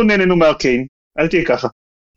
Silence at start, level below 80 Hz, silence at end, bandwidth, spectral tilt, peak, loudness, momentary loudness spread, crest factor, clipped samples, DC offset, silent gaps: 0 s; -40 dBFS; 0.45 s; 7.8 kHz; -6 dB/octave; -2 dBFS; -15 LUFS; 10 LU; 14 dB; under 0.1%; under 0.1%; 0.89-1.11 s